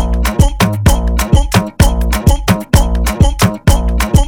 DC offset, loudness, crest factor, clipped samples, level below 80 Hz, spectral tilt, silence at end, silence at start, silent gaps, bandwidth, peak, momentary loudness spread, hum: under 0.1%; -13 LUFS; 10 dB; 2%; -14 dBFS; -5.5 dB/octave; 0 s; 0 s; none; over 20 kHz; 0 dBFS; 3 LU; none